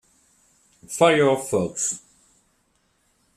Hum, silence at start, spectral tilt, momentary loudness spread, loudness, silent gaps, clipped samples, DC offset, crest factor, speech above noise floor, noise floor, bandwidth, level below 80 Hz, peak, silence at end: none; 0.9 s; -3.5 dB/octave; 15 LU; -21 LUFS; none; under 0.1%; under 0.1%; 22 dB; 46 dB; -67 dBFS; 15 kHz; -64 dBFS; -4 dBFS; 1.4 s